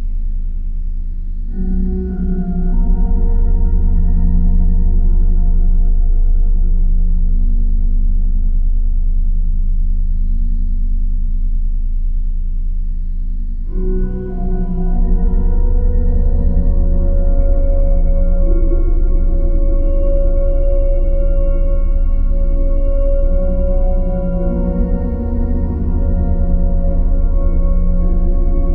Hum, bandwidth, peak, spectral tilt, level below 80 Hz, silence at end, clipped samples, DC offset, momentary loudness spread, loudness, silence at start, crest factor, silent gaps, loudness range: none; 1.5 kHz; -2 dBFS; -13.5 dB/octave; -12 dBFS; 0 s; under 0.1%; under 0.1%; 6 LU; -19 LUFS; 0 s; 10 dB; none; 4 LU